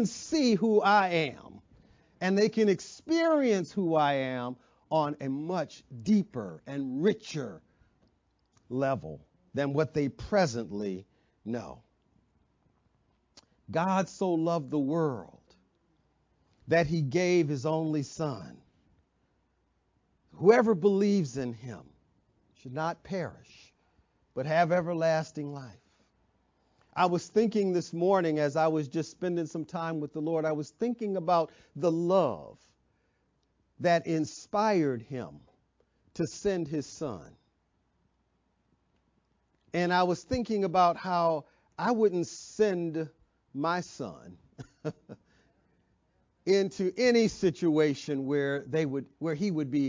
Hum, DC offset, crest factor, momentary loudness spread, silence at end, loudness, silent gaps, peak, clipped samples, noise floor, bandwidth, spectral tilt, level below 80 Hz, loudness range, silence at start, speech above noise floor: none; under 0.1%; 22 dB; 15 LU; 0 s; -29 LUFS; none; -8 dBFS; under 0.1%; -74 dBFS; 7.6 kHz; -6 dB/octave; -64 dBFS; 7 LU; 0 s; 45 dB